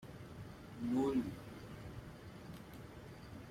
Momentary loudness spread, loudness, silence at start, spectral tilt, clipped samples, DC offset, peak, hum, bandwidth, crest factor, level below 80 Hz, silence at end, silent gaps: 17 LU; -44 LUFS; 0 s; -7 dB/octave; under 0.1%; under 0.1%; -26 dBFS; none; 16 kHz; 18 dB; -62 dBFS; 0 s; none